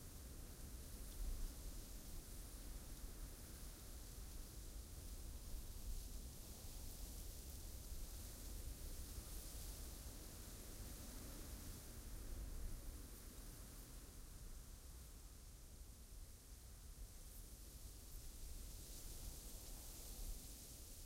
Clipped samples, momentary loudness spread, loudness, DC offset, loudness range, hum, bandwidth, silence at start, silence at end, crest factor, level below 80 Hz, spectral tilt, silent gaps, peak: under 0.1%; 6 LU; -56 LUFS; under 0.1%; 5 LU; none; 16 kHz; 0 s; 0 s; 16 dB; -54 dBFS; -3.5 dB/octave; none; -36 dBFS